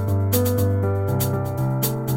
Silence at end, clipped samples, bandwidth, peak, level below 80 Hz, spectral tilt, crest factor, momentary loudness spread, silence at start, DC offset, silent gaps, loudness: 0 s; under 0.1%; 16.5 kHz; -6 dBFS; -46 dBFS; -6.5 dB/octave; 14 dB; 4 LU; 0 s; under 0.1%; none; -22 LUFS